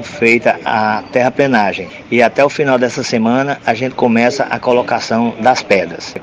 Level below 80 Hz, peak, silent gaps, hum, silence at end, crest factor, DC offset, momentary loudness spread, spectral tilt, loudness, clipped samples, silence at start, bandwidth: -52 dBFS; 0 dBFS; none; none; 0 s; 14 dB; under 0.1%; 5 LU; -5 dB/octave; -13 LUFS; under 0.1%; 0 s; 9.6 kHz